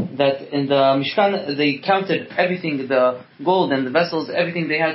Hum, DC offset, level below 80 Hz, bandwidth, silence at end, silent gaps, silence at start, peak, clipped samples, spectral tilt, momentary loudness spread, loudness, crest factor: none; under 0.1%; -70 dBFS; 5.8 kHz; 0 s; none; 0 s; -4 dBFS; under 0.1%; -10 dB/octave; 5 LU; -19 LUFS; 16 dB